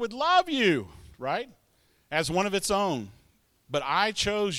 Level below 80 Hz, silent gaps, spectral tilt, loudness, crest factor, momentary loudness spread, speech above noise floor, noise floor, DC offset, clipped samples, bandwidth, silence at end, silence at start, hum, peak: -56 dBFS; none; -3.5 dB/octave; -27 LUFS; 18 dB; 13 LU; 40 dB; -66 dBFS; under 0.1%; under 0.1%; 16.5 kHz; 0 s; 0 s; none; -10 dBFS